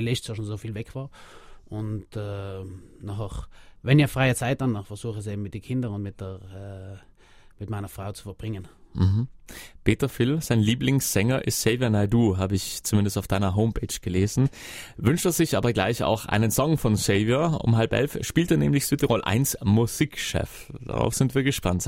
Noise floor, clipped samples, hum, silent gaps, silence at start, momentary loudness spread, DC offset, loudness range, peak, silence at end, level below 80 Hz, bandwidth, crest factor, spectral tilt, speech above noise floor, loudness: -52 dBFS; under 0.1%; none; none; 0 s; 16 LU; under 0.1%; 11 LU; -4 dBFS; 0 s; -44 dBFS; 16.5 kHz; 20 dB; -5.5 dB/octave; 27 dB; -25 LUFS